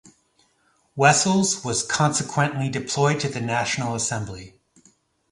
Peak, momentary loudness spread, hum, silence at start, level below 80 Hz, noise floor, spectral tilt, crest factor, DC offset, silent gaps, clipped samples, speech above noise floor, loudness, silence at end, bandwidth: 0 dBFS; 10 LU; none; 0.95 s; -56 dBFS; -65 dBFS; -3.5 dB/octave; 24 dB; under 0.1%; none; under 0.1%; 43 dB; -22 LUFS; 0.85 s; 11.5 kHz